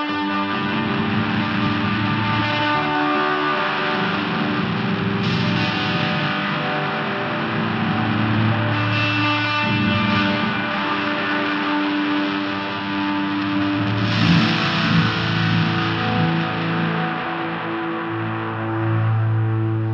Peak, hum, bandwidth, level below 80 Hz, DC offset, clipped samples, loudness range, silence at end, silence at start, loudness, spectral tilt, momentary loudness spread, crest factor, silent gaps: -4 dBFS; none; 7 kHz; -50 dBFS; under 0.1%; under 0.1%; 3 LU; 0 s; 0 s; -20 LUFS; -7 dB/octave; 5 LU; 16 dB; none